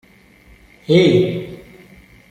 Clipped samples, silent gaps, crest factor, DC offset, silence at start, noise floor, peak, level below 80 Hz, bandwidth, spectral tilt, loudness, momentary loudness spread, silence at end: under 0.1%; none; 18 dB; under 0.1%; 0.9 s; -48 dBFS; -2 dBFS; -50 dBFS; 9.6 kHz; -7 dB/octave; -15 LUFS; 25 LU; 0.75 s